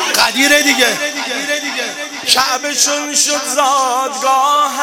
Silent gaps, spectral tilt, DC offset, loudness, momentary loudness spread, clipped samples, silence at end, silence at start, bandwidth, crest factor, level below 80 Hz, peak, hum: none; 0.5 dB/octave; under 0.1%; -13 LUFS; 9 LU; under 0.1%; 0 s; 0 s; 17.5 kHz; 14 dB; -60 dBFS; 0 dBFS; none